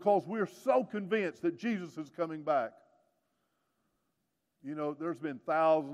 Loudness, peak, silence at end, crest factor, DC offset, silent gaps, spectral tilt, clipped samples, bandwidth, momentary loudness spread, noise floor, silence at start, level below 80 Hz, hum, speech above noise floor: -33 LUFS; -16 dBFS; 0 s; 18 dB; under 0.1%; none; -7 dB/octave; under 0.1%; 14 kHz; 10 LU; -82 dBFS; 0 s; -88 dBFS; none; 50 dB